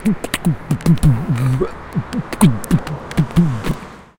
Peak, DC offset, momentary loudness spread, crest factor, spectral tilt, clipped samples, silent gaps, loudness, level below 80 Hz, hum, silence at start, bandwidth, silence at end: 0 dBFS; under 0.1%; 10 LU; 16 dB; -6.5 dB/octave; under 0.1%; none; -18 LUFS; -32 dBFS; none; 0 s; 17 kHz; 0.15 s